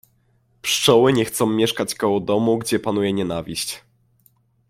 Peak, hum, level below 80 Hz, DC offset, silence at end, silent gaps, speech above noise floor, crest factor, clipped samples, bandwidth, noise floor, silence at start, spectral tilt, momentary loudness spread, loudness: -2 dBFS; none; -56 dBFS; under 0.1%; 0.9 s; none; 42 dB; 18 dB; under 0.1%; 16.5 kHz; -62 dBFS; 0.65 s; -4 dB/octave; 11 LU; -20 LUFS